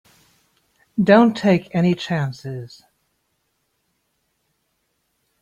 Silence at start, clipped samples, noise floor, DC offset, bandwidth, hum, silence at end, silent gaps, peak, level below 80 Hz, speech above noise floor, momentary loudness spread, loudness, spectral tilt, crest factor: 0.95 s; under 0.1%; -71 dBFS; under 0.1%; 8.6 kHz; none; 2.75 s; none; -2 dBFS; -62 dBFS; 53 dB; 19 LU; -18 LUFS; -7.5 dB/octave; 20 dB